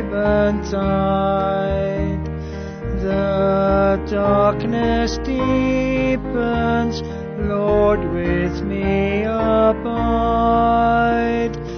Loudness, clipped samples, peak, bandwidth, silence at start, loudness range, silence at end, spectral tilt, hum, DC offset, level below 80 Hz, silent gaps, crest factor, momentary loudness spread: -19 LUFS; under 0.1%; -4 dBFS; 6.6 kHz; 0 s; 2 LU; 0 s; -7.5 dB/octave; none; under 0.1%; -30 dBFS; none; 14 dB; 7 LU